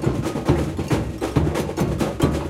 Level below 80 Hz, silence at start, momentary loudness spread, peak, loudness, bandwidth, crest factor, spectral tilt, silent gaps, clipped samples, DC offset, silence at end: -32 dBFS; 0 s; 2 LU; -2 dBFS; -23 LUFS; 16 kHz; 18 dB; -6.5 dB/octave; none; under 0.1%; under 0.1%; 0 s